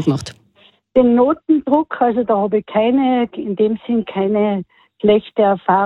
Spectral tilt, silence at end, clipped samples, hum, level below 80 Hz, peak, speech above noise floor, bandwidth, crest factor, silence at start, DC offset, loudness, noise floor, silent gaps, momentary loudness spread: -7.5 dB/octave; 0 s; under 0.1%; none; -52 dBFS; -2 dBFS; 37 dB; 10.5 kHz; 14 dB; 0 s; under 0.1%; -16 LUFS; -53 dBFS; none; 6 LU